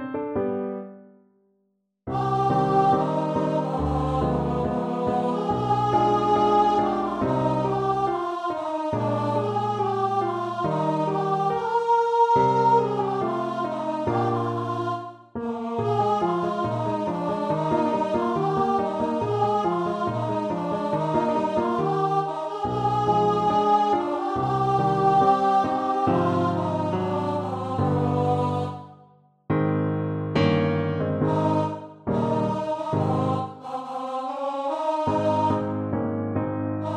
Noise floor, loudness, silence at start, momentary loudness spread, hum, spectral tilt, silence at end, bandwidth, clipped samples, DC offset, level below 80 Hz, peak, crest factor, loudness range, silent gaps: -72 dBFS; -24 LUFS; 0 s; 8 LU; none; -8 dB/octave; 0 s; 10.5 kHz; under 0.1%; under 0.1%; -48 dBFS; -8 dBFS; 16 dB; 4 LU; none